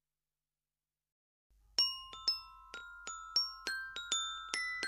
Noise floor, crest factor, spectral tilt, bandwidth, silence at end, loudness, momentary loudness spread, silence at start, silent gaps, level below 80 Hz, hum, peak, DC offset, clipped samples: under -90 dBFS; 26 dB; 2 dB/octave; 14 kHz; 0 s; -36 LUFS; 14 LU; 1.8 s; none; -70 dBFS; 50 Hz at -70 dBFS; -14 dBFS; under 0.1%; under 0.1%